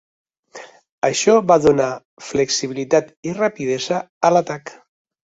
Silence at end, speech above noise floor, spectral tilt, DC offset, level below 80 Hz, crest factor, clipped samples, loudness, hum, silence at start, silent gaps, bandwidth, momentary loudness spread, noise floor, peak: 0.55 s; 23 dB; -4 dB/octave; under 0.1%; -56 dBFS; 18 dB; under 0.1%; -18 LUFS; none; 0.55 s; 0.91-1.02 s, 2.05-2.17 s, 3.17-3.23 s, 4.09-4.21 s; 8 kHz; 17 LU; -41 dBFS; -2 dBFS